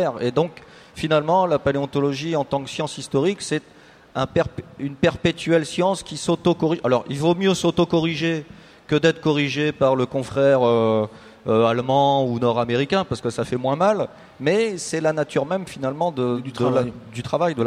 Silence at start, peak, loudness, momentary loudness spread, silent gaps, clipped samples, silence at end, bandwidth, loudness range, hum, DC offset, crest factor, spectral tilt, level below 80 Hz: 0 s; -4 dBFS; -21 LUFS; 9 LU; none; under 0.1%; 0 s; 13.5 kHz; 4 LU; none; under 0.1%; 18 dB; -6 dB/octave; -52 dBFS